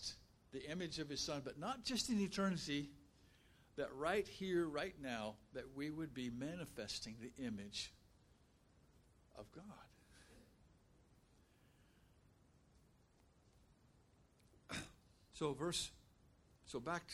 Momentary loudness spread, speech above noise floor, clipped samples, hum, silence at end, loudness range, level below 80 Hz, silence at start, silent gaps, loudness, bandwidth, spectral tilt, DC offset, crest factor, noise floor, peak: 18 LU; 28 dB; under 0.1%; none; 0 s; 21 LU; -70 dBFS; 0 s; none; -45 LUFS; 16 kHz; -4 dB/octave; under 0.1%; 22 dB; -73 dBFS; -26 dBFS